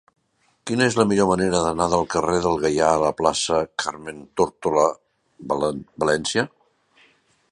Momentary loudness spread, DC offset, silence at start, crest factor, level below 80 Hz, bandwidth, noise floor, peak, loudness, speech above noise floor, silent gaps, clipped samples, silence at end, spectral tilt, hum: 11 LU; under 0.1%; 0.65 s; 20 dB; -50 dBFS; 11.5 kHz; -66 dBFS; -2 dBFS; -21 LUFS; 45 dB; none; under 0.1%; 1.05 s; -4.5 dB/octave; none